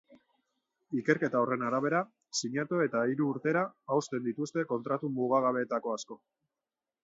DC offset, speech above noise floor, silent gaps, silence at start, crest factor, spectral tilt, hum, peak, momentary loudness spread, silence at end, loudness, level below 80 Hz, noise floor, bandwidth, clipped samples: under 0.1%; over 59 dB; none; 0.9 s; 20 dB; -5 dB/octave; none; -12 dBFS; 7 LU; 0.9 s; -31 LUFS; -80 dBFS; under -90 dBFS; 8 kHz; under 0.1%